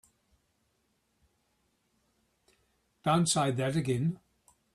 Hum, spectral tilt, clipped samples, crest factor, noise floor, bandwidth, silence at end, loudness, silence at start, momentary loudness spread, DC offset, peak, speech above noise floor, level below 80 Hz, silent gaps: none; -5 dB/octave; under 0.1%; 20 dB; -76 dBFS; 13 kHz; 0.6 s; -29 LUFS; 3.05 s; 9 LU; under 0.1%; -14 dBFS; 47 dB; -68 dBFS; none